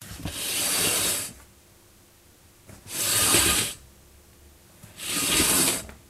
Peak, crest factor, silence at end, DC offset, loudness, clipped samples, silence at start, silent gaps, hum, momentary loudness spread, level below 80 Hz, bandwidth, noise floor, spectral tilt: -6 dBFS; 22 dB; 0.15 s; under 0.1%; -22 LUFS; under 0.1%; 0 s; none; none; 16 LU; -48 dBFS; 16 kHz; -55 dBFS; -1 dB/octave